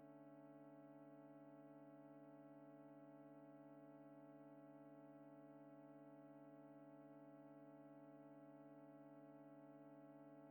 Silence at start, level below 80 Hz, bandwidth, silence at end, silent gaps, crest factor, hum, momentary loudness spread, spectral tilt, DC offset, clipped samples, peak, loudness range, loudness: 0 s; under -90 dBFS; 19 kHz; 0 s; none; 10 dB; none; 0 LU; -8.5 dB/octave; under 0.1%; under 0.1%; -54 dBFS; 0 LU; -64 LUFS